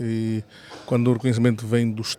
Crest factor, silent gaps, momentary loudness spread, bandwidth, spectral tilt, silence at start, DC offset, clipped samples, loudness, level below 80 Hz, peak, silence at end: 16 dB; none; 13 LU; 14.5 kHz; -6.5 dB/octave; 0 s; under 0.1%; under 0.1%; -23 LUFS; -62 dBFS; -6 dBFS; 0.05 s